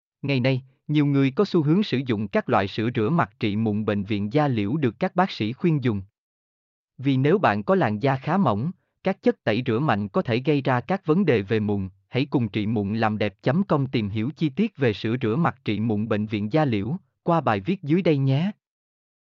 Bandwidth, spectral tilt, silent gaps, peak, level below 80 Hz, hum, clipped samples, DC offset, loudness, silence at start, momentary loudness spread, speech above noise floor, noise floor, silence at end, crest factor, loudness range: 7 kHz; -9 dB/octave; 6.18-6.88 s; -8 dBFS; -64 dBFS; none; under 0.1%; under 0.1%; -24 LUFS; 0.25 s; 6 LU; over 67 dB; under -90 dBFS; 0.9 s; 16 dB; 2 LU